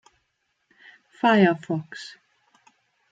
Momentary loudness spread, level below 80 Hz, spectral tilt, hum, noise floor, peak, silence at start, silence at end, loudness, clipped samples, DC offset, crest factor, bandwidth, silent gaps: 21 LU; -72 dBFS; -7 dB/octave; none; -74 dBFS; -6 dBFS; 1.25 s; 1 s; -22 LUFS; under 0.1%; under 0.1%; 20 dB; 7.8 kHz; none